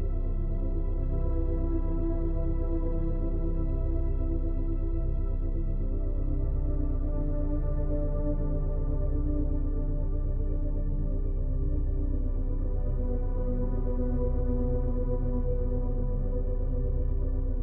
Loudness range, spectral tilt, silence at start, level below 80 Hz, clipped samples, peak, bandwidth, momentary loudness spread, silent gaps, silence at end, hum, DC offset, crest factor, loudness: 1 LU; -12.5 dB/octave; 0 s; -28 dBFS; under 0.1%; -16 dBFS; 2.1 kHz; 2 LU; none; 0 s; none; under 0.1%; 10 dB; -32 LUFS